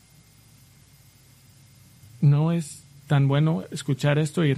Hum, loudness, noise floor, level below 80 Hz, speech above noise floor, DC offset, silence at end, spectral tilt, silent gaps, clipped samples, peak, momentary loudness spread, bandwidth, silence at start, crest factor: none; -23 LUFS; -54 dBFS; -60 dBFS; 32 dB; under 0.1%; 0 s; -7 dB/octave; none; under 0.1%; -8 dBFS; 9 LU; 12.5 kHz; 2.2 s; 16 dB